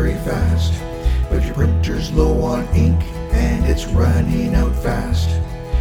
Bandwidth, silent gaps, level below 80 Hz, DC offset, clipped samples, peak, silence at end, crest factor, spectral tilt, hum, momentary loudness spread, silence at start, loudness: 15.5 kHz; none; -20 dBFS; under 0.1%; under 0.1%; -2 dBFS; 0 s; 14 dB; -7 dB/octave; none; 5 LU; 0 s; -18 LUFS